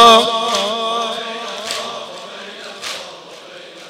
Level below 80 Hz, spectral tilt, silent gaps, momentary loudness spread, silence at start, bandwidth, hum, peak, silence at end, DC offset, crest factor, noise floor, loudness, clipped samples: -60 dBFS; -1.5 dB/octave; none; 19 LU; 0 s; 16.5 kHz; none; 0 dBFS; 0 s; under 0.1%; 18 dB; -36 dBFS; -18 LUFS; under 0.1%